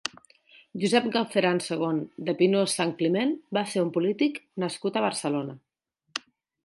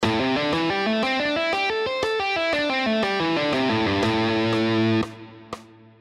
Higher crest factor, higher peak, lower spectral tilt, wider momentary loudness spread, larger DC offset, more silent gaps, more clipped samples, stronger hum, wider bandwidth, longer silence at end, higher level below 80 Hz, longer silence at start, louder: first, 20 dB vs 14 dB; about the same, -8 dBFS vs -10 dBFS; about the same, -4.5 dB/octave vs -5.5 dB/octave; first, 13 LU vs 7 LU; neither; neither; neither; neither; about the same, 11.5 kHz vs 12 kHz; about the same, 0.45 s vs 0.35 s; second, -76 dBFS vs -52 dBFS; about the same, 0.05 s vs 0 s; second, -27 LUFS vs -22 LUFS